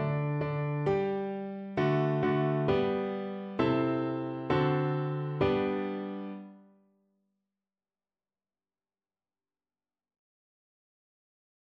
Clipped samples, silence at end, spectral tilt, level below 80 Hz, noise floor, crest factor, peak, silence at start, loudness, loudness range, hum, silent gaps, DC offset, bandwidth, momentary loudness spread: under 0.1%; 5.2 s; -9 dB/octave; -60 dBFS; under -90 dBFS; 18 dB; -14 dBFS; 0 s; -31 LUFS; 10 LU; none; none; under 0.1%; 6 kHz; 9 LU